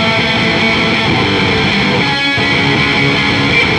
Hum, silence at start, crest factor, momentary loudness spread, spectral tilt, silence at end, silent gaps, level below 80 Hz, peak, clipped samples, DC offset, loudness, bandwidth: none; 0 s; 12 dB; 1 LU; -5 dB/octave; 0 s; none; -34 dBFS; 0 dBFS; under 0.1%; under 0.1%; -11 LUFS; 13 kHz